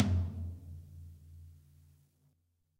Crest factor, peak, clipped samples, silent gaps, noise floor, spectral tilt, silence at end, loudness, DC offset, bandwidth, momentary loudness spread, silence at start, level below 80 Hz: 24 dB; -14 dBFS; under 0.1%; none; -76 dBFS; -8 dB/octave; 1.25 s; -39 LUFS; under 0.1%; 7.4 kHz; 23 LU; 0 s; -52 dBFS